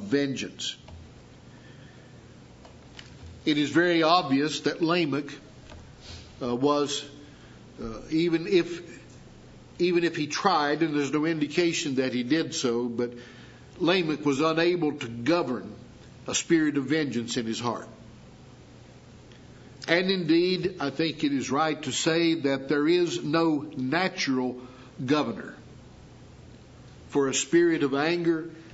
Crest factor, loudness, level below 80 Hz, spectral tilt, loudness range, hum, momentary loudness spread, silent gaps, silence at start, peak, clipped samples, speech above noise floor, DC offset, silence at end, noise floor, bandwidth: 22 dB; -26 LUFS; -60 dBFS; -4.5 dB/octave; 5 LU; none; 21 LU; none; 0 s; -6 dBFS; under 0.1%; 24 dB; under 0.1%; 0 s; -49 dBFS; 8 kHz